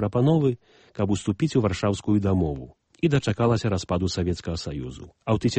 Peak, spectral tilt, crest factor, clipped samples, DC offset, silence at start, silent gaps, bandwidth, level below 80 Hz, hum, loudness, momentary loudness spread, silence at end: -8 dBFS; -7 dB/octave; 16 dB; under 0.1%; under 0.1%; 0 s; none; 8.8 kHz; -44 dBFS; none; -25 LUFS; 13 LU; 0 s